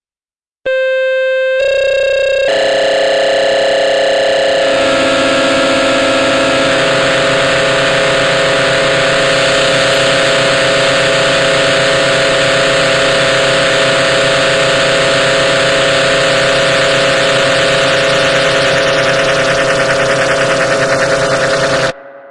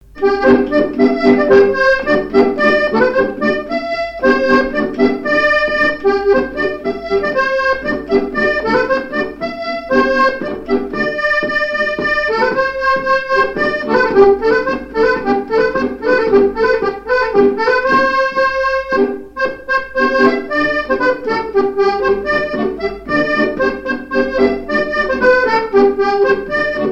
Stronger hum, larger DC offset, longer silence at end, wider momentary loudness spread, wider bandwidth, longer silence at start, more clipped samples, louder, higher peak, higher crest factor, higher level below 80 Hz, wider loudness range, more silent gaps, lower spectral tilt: neither; first, 0.5% vs under 0.1%; about the same, 0 s vs 0 s; second, 2 LU vs 7 LU; first, 11.5 kHz vs 7.8 kHz; first, 0.65 s vs 0.15 s; neither; first, -10 LUFS vs -14 LUFS; about the same, 0 dBFS vs 0 dBFS; about the same, 10 dB vs 14 dB; about the same, -40 dBFS vs -40 dBFS; about the same, 2 LU vs 3 LU; neither; second, -3 dB/octave vs -5.5 dB/octave